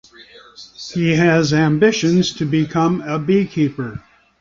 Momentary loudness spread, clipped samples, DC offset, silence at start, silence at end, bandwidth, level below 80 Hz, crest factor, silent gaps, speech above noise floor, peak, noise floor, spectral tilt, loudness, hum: 14 LU; under 0.1%; under 0.1%; 0.2 s; 0.4 s; 7.4 kHz; -50 dBFS; 16 dB; none; 27 dB; -2 dBFS; -44 dBFS; -6 dB/octave; -17 LUFS; none